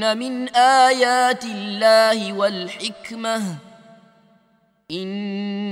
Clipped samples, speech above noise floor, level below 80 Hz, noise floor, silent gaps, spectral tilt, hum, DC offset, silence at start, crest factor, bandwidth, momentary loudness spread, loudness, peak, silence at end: under 0.1%; 42 dB; -72 dBFS; -61 dBFS; none; -3.5 dB/octave; none; under 0.1%; 0 s; 18 dB; 15 kHz; 14 LU; -19 LUFS; -2 dBFS; 0 s